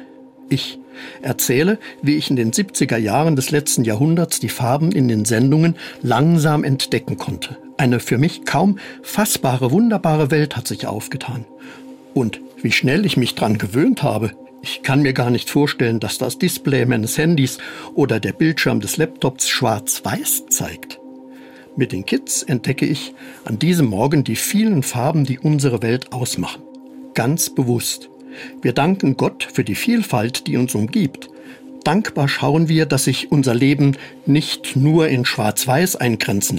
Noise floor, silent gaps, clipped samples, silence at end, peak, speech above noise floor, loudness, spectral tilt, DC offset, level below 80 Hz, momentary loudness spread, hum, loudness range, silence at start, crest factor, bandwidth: -41 dBFS; none; under 0.1%; 0 s; -4 dBFS; 23 dB; -18 LUFS; -5 dB/octave; under 0.1%; -54 dBFS; 11 LU; none; 4 LU; 0 s; 14 dB; 16.5 kHz